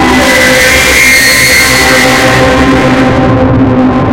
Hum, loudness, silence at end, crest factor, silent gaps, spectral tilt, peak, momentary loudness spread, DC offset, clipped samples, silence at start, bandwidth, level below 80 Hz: none; -4 LUFS; 0 s; 6 dB; none; -3.5 dB/octave; 0 dBFS; 4 LU; under 0.1%; 4%; 0 s; over 20 kHz; -22 dBFS